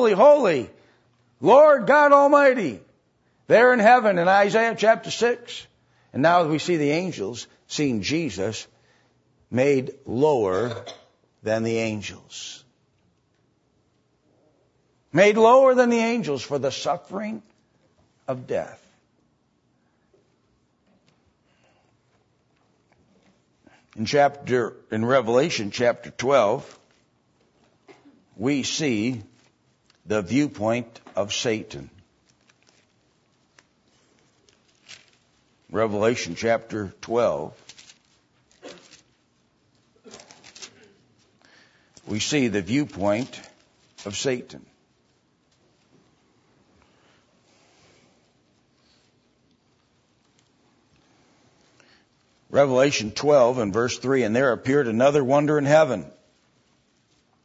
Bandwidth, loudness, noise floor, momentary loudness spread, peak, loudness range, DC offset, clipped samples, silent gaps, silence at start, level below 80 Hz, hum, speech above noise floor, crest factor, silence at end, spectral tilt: 8 kHz; -21 LUFS; -67 dBFS; 20 LU; -4 dBFS; 15 LU; under 0.1%; under 0.1%; none; 0 s; -64 dBFS; none; 46 dB; 20 dB; 1.35 s; -5 dB/octave